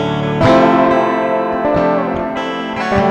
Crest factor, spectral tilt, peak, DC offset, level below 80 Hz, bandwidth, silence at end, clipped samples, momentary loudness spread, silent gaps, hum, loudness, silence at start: 14 dB; -7 dB/octave; 0 dBFS; under 0.1%; -38 dBFS; 9.4 kHz; 0 s; under 0.1%; 9 LU; none; none; -14 LUFS; 0 s